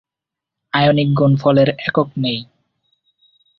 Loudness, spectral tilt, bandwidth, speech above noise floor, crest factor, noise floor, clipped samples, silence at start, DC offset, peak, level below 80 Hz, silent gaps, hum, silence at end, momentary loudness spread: -16 LUFS; -9 dB/octave; 6 kHz; 70 dB; 16 dB; -85 dBFS; under 0.1%; 0.75 s; under 0.1%; -2 dBFS; -52 dBFS; none; none; 1.15 s; 8 LU